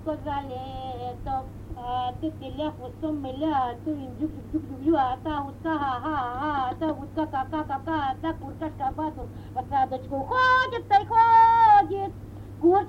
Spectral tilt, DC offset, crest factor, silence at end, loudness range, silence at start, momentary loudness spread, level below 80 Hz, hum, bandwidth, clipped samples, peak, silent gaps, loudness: -7 dB/octave; under 0.1%; 16 dB; 0 s; 10 LU; 0 s; 16 LU; -46 dBFS; none; 8.6 kHz; under 0.1%; -8 dBFS; none; -25 LUFS